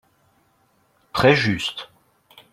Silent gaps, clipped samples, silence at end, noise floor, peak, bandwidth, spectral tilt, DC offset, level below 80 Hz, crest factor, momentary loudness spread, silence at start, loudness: none; under 0.1%; 0.7 s; -63 dBFS; -2 dBFS; 15.5 kHz; -5.5 dB/octave; under 0.1%; -52 dBFS; 22 dB; 20 LU; 1.15 s; -19 LUFS